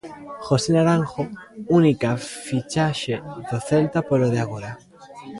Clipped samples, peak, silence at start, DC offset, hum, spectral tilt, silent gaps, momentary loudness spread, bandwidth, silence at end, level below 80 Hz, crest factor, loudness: under 0.1%; -6 dBFS; 0.05 s; under 0.1%; none; -6.5 dB/octave; none; 18 LU; 11.5 kHz; 0 s; -54 dBFS; 16 dB; -22 LUFS